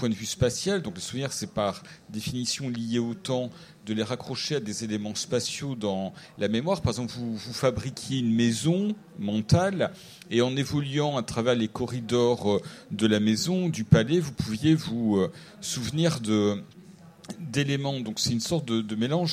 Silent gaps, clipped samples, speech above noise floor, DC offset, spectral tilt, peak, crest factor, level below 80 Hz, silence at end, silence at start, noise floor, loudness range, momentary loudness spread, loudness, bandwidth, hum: none; under 0.1%; 23 dB; under 0.1%; -5.5 dB/octave; -4 dBFS; 22 dB; -54 dBFS; 0 s; 0 s; -49 dBFS; 5 LU; 9 LU; -27 LUFS; 15.5 kHz; none